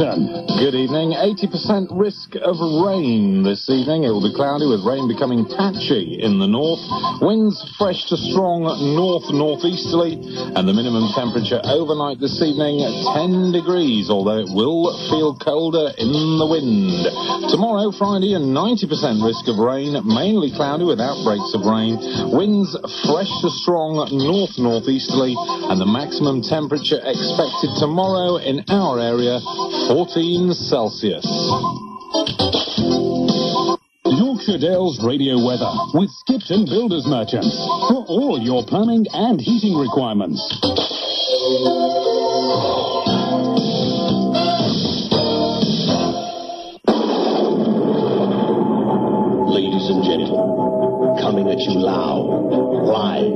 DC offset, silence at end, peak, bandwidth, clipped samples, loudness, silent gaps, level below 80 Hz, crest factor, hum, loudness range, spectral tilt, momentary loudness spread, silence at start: under 0.1%; 0 s; -4 dBFS; 6.4 kHz; under 0.1%; -18 LUFS; none; -54 dBFS; 14 dB; none; 1 LU; -6.5 dB/octave; 3 LU; 0 s